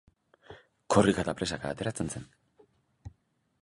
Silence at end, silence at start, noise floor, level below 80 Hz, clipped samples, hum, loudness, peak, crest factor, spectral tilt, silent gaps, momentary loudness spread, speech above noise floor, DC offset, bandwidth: 0.55 s; 0.5 s; -69 dBFS; -54 dBFS; under 0.1%; none; -29 LUFS; -8 dBFS; 24 dB; -5 dB/octave; none; 27 LU; 40 dB; under 0.1%; 11.5 kHz